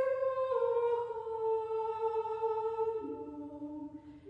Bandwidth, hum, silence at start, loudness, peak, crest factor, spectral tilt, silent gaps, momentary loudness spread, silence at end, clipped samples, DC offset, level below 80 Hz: 5.2 kHz; none; 0 s; -35 LUFS; -22 dBFS; 14 dB; -7 dB/octave; none; 12 LU; 0 s; under 0.1%; under 0.1%; -70 dBFS